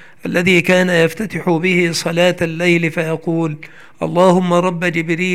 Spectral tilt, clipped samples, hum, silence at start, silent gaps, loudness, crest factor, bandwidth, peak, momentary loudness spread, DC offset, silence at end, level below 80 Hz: -5.5 dB/octave; under 0.1%; none; 0.25 s; none; -15 LUFS; 14 dB; 15 kHz; 0 dBFS; 8 LU; 0.8%; 0 s; -54 dBFS